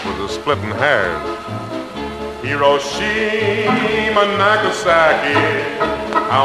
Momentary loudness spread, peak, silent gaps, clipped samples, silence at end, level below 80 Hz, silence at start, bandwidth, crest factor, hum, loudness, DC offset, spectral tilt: 12 LU; 0 dBFS; none; under 0.1%; 0 s; -44 dBFS; 0 s; 13 kHz; 16 dB; none; -16 LUFS; under 0.1%; -4.5 dB/octave